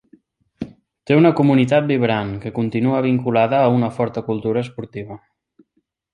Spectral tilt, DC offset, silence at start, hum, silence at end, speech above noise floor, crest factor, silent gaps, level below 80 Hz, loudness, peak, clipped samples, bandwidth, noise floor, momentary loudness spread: -8.5 dB/octave; under 0.1%; 0.6 s; none; 0.95 s; 52 dB; 16 dB; none; -54 dBFS; -18 LUFS; -2 dBFS; under 0.1%; 9.8 kHz; -69 dBFS; 20 LU